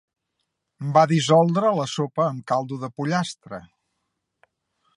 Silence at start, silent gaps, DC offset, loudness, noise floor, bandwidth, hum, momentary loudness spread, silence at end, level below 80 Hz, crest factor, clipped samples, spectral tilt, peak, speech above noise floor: 0.8 s; none; under 0.1%; -22 LUFS; -78 dBFS; 11 kHz; none; 16 LU; 1.35 s; -70 dBFS; 20 dB; under 0.1%; -6 dB/octave; -4 dBFS; 56 dB